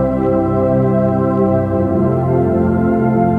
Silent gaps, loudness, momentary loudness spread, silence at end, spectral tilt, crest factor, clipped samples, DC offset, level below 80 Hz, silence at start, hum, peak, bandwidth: none; -15 LUFS; 1 LU; 0 s; -11.5 dB/octave; 12 dB; under 0.1%; under 0.1%; -34 dBFS; 0 s; none; -2 dBFS; 3.6 kHz